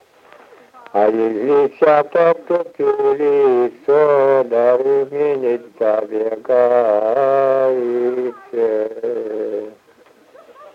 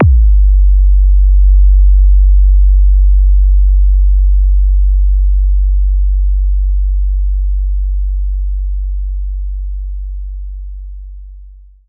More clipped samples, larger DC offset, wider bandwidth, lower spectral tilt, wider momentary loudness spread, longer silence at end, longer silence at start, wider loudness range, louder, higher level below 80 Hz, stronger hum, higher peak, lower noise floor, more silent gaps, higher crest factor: neither; neither; first, 5.6 kHz vs 0.5 kHz; second, -7.5 dB/octave vs -16 dB/octave; second, 10 LU vs 15 LU; second, 0.1 s vs 0.4 s; first, 0.95 s vs 0 s; second, 4 LU vs 11 LU; second, -16 LUFS vs -13 LUFS; second, -72 dBFS vs -8 dBFS; neither; about the same, -2 dBFS vs -2 dBFS; first, -50 dBFS vs -35 dBFS; neither; first, 14 dB vs 8 dB